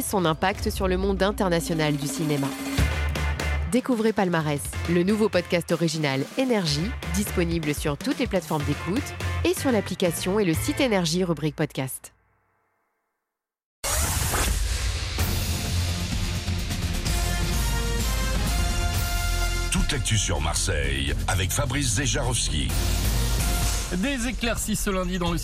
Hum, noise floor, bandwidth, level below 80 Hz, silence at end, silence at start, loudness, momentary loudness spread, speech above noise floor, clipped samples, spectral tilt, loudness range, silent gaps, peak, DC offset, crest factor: none; -85 dBFS; 16 kHz; -32 dBFS; 0 s; 0 s; -25 LUFS; 5 LU; 61 dB; under 0.1%; -4.5 dB/octave; 3 LU; 13.64-13.83 s; -8 dBFS; under 0.1%; 16 dB